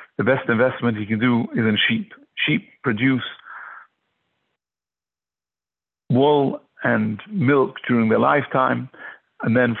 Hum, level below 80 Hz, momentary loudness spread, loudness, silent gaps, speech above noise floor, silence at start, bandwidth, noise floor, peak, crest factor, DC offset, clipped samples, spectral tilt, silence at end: none; -60 dBFS; 16 LU; -20 LUFS; none; over 71 dB; 0 s; 4.2 kHz; under -90 dBFS; -6 dBFS; 16 dB; under 0.1%; under 0.1%; -10 dB/octave; 0 s